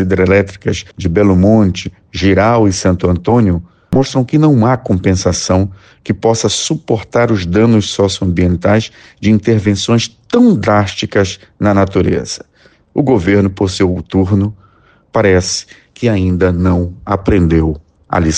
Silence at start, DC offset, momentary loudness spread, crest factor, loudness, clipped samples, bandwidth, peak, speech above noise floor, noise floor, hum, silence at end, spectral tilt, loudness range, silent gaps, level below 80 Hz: 0 s; under 0.1%; 9 LU; 12 dB; -13 LUFS; under 0.1%; 9.6 kHz; 0 dBFS; 36 dB; -48 dBFS; none; 0 s; -6 dB/octave; 2 LU; none; -32 dBFS